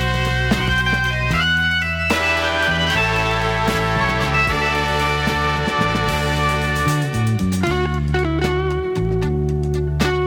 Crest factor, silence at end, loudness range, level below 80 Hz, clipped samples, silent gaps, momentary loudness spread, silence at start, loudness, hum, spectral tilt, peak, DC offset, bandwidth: 14 dB; 0 s; 2 LU; -28 dBFS; under 0.1%; none; 4 LU; 0 s; -18 LUFS; none; -5 dB/octave; -4 dBFS; under 0.1%; 18 kHz